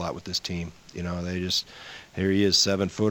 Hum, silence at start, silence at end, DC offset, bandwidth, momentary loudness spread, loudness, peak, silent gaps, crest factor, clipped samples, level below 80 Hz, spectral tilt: none; 0 s; 0 s; under 0.1%; 18 kHz; 18 LU; -25 LUFS; -8 dBFS; none; 18 dB; under 0.1%; -52 dBFS; -4 dB/octave